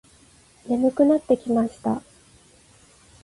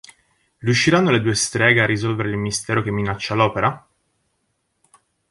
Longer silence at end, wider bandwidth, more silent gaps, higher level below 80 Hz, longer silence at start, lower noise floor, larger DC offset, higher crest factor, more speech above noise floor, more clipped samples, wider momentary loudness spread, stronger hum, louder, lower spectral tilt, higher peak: second, 1.25 s vs 1.5 s; about the same, 11.5 kHz vs 11.5 kHz; neither; second, -58 dBFS vs -50 dBFS; about the same, 0.65 s vs 0.6 s; second, -54 dBFS vs -71 dBFS; neither; about the same, 18 dB vs 18 dB; second, 34 dB vs 52 dB; neither; about the same, 9 LU vs 8 LU; neither; second, -22 LUFS vs -19 LUFS; first, -7.5 dB/octave vs -4.5 dB/octave; second, -6 dBFS vs -2 dBFS